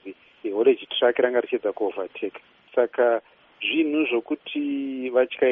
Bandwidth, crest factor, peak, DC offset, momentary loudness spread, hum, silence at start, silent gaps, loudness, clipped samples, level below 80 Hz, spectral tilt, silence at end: 3.8 kHz; 18 dB; -6 dBFS; under 0.1%; 10 LU; none; 0.05 s; none; -24 LUFS; under 0.1%; -74 dBFS; -1 dB/octave; 0 s